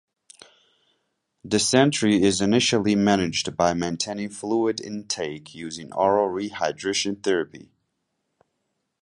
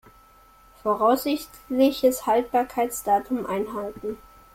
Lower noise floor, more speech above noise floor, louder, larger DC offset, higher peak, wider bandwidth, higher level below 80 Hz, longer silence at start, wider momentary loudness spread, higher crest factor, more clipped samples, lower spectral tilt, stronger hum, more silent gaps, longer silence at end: first, -77 dBFS vs -54 dBFS; first, 54 dB vs 30 dB; about the same, -23 LUFS vs -24 LUFS; neither; first, -2 dBFS vs -8 dBFS; second, 11.5 kHz vs 16.5 kHz; about the same, -56 dBFS vs -56 dBFS; first, 1.45 s vs 0.85 s; about the same, 12 LU vs 11 LU; first, 22 dB vs 16 dB; neither; about the same, -4 dB/octave vs -4 dB/octave; neither; neither; first, 1.4 s vs 0.4 s